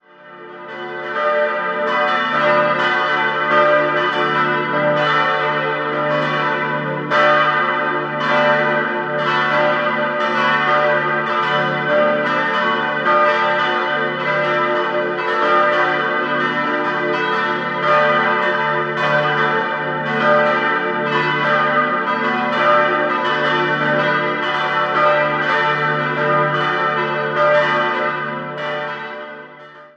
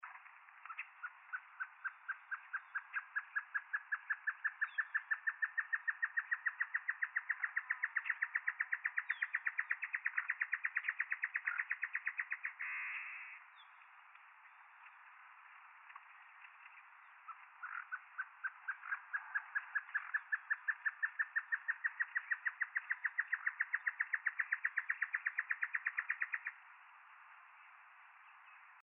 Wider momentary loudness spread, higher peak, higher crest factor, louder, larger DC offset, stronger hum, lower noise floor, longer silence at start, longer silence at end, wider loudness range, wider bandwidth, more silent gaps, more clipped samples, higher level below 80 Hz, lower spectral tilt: second, 5 LU vs 21 LU; first, -2 dBFS vs -24 dBFS; about the same, 16 dB vs 20 dB; first, -16 LUFS vs -40 LUFS; neither; neither; second, -39 dBFS vs -62 dBFS; first, 0.2 s vs 0 s; about the same, 0.1 s vs 0 s; second, 1 LU vs 12 LU; first, 8 kHz vs 3.7 kHz; neither; neither; first, -66 dBFS vs under -90 dBFS; first, -5.5 dB/octave vs 17.5 dB/octave